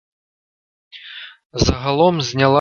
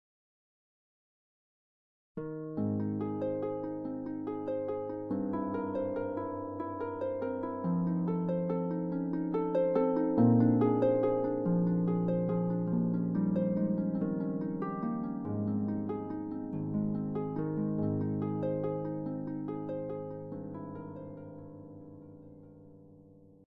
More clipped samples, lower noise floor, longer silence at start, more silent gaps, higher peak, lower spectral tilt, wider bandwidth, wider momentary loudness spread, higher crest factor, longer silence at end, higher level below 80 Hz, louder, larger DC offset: neither; second, -37 dBFS vs -57 dBFS; second, 0.95 s vs 2.15 s; first, 1.45-1.50 s vs none; first, 0 dBFS vs -14 dBFS; second, -5 dB/octave vs -12.5 dB/octave; first, 7.2 kHz vs 4 kHz; first, 19 LU vs 14 LU; about the same, 18 dB vs 18 dB; second, 0 s vs 0.35 s; first, -34 dBFS vs -64 dBFS; first, -17 LUFS vs -33 LUFS; neither